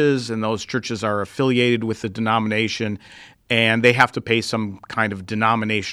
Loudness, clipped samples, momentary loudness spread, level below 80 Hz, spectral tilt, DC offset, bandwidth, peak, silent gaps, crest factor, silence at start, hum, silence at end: -20 LUFS; under 0.1%; 10 LU; -58 dBFS; -5 dB/octave; under 0.1%; 13.5 kHz; 0 dBFS; none; 20 dB; 0 s; none; 0 s